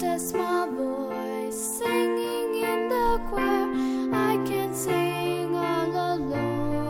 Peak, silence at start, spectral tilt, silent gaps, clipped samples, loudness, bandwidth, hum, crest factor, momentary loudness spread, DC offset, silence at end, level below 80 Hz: -10 dBFS; 0 s; -5 dB/octave; none; under 0.1%; -26 LUFS; 18 kHz; none; 14 dB; 5 LU; under 0.1%; 0 s; -44 dBFS